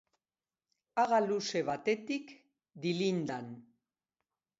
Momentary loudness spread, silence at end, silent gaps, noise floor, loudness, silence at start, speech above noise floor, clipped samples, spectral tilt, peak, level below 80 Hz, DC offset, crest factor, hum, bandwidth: 15 LU; 1 s; none; under -90 dBFS; -34 LUFS; 0.95 s; over 57 dB; under 0.1%; -4 dB/octave; -18 dBFS; -80 dBFS; under 0.1%; 18 dB; none; 7.6 kHz